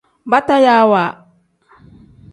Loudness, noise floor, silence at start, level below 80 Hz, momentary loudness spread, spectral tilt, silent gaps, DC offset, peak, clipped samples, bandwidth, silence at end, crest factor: -13 LUFS; -53 dBFS; 0.25 s; -56 dBFS; 6 LU; -6 dB/octave; none; under 0.1%; 0 dBFS; under 0.1%; 11.5 kHz; 1.2 s; 16 dB